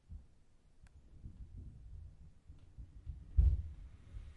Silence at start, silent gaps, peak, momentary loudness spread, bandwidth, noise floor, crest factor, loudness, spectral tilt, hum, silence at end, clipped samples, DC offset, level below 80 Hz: 0.1 s; none; -18 dBFS; 26 LU; 2.8 kHz; -64 dBFS; 22 dB; -38 LUFS; -9 dB/octave; none; 0.05 s; under 0.1%; under 0.1%; -42 dBFS